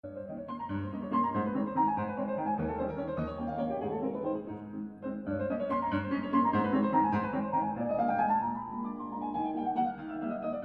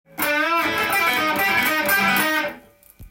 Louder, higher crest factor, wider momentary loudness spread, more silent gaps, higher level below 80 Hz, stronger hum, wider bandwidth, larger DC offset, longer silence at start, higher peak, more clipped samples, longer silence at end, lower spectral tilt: second, -32 LUFS vs -19 LUFS; about the same, 18 dB vs 16 dB; first, 10 LU vs 4 LU; neither; about the same, -56 dBFS vs -54 dBFS; neither; second, 5.2 kHz vs 17 kHz; neither; about the same, 0.05 s vs 0.15 s; second, -14 dBFS vs -6 dBFS; neither; about the same, 0 s vs 0.05 s; first, -10 dB/octave vs -2.5 dB/octave